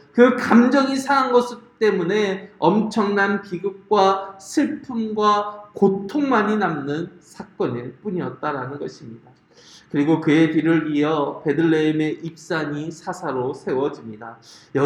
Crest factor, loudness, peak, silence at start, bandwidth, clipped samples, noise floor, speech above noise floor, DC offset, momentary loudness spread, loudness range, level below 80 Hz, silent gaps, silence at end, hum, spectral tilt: 20 dB; -20 LUFS; 0 dBFS; 0.15 s; 12 kHz; under 0.1%; -49 dBFS; 29 dB; under 0.1%; 13 LU; 5 LU; -64 dBFS; none; 0 s; none; -6 dB/octave